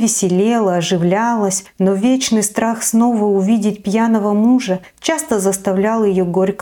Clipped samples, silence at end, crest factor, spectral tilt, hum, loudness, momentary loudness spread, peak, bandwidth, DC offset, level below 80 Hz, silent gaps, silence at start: under 0.1%; 0.05 s; 14 dB; -5 dB/octave; none; -15 LUFS; 3 LU; -2 dBFS; 18 kHz; under 0.1%; -54 dBFS; none; 0 s